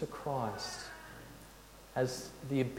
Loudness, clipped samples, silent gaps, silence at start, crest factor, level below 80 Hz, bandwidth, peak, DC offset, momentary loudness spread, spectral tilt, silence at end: -39 LUFS; under 0.1%; none; 0 s; 18 dB; -62 dBFS; 16.5 kHz; -20 dBFS; under 0.1%; 17 LU; -5 dB/octave; 0 s